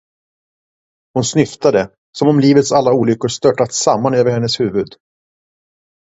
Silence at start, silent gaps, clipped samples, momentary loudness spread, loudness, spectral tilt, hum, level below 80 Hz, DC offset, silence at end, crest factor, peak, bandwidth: 1.15 s; 1.98-2.13 s; under 0.1%; 8 LU; -14 LUFS; -5 dB/octave; none; -52 dBFS; under 0.1%; 1.25 s; 16 dB; 0 dBFS; 8 kHz